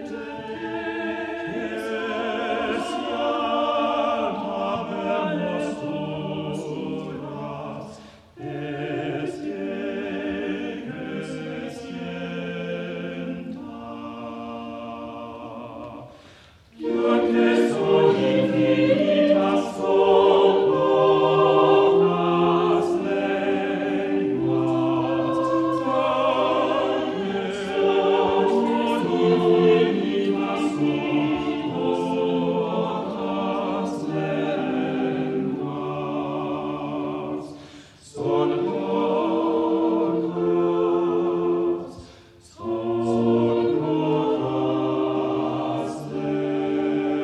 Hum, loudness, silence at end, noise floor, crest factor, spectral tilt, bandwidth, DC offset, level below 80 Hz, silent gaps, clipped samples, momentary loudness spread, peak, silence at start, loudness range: none; -23 LUFS; 0 s; -50 dBFS; 18 dB; -7 dB/octave; 10.5 kHz; under 0.1%; -60 dBFS; none; under 0.1%; 15 LU; -6 dBFS; 0 s; 12 LU